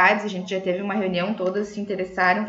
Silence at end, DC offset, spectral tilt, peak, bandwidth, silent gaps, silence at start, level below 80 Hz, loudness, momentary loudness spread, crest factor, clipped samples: 0 s; under 0.1%; -5.5 dB/octave; -4 dBFS; 8 kHz; none; 0 s; -62 dBFS; -24 LUFS; 8 LU; 18 dB; under 0.1%